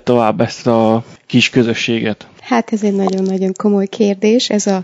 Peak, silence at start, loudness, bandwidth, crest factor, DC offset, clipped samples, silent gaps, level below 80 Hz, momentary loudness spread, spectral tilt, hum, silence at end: 0 dBFS; 0.05 s; -15 LUFS; 8 kHz; 14 dB; under 0.1%; 0.3%; none; -56 dBFS; 5 LU; -5 dB/octave; none; 0 s